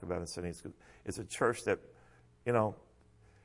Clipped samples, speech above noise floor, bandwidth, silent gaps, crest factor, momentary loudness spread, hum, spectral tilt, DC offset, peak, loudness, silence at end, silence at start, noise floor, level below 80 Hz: under 0.1%; 28 dB; 11.5 kHz; none; 20 dB; 16 LU; none; -5.5 dB/octave; under 0.1%; -16 dBFS; -36 LUFS; 0.65 s; 0 s; -63 dBFS; -64 dBFS